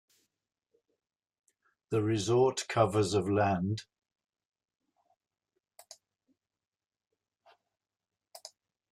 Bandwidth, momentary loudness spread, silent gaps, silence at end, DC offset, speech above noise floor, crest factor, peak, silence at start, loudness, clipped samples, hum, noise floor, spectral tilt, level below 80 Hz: 14.5 kHz; 19 LU; 4.45-4.50 s; 0.45 s; under 0.1%; over 61 dB; 22 dB; -12 dBFS; 1.9 s; -30 LUFS; under 0.1%; none; under -90 dBFS; -5.5 dB/octave; -70 dBFS